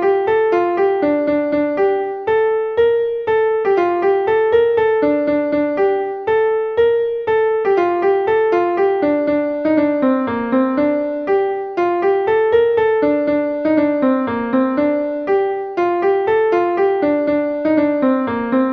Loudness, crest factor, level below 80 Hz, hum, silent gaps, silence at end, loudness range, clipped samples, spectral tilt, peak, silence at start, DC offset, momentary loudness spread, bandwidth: -16 LUFS; 12 dB; -54 dBFS; none; none; 0 s; 1 LU; under 0.1%; -7.5 dB/octave; -4 dBFS; 0 s; under 0.1%; 3 LU; 5.6 kHz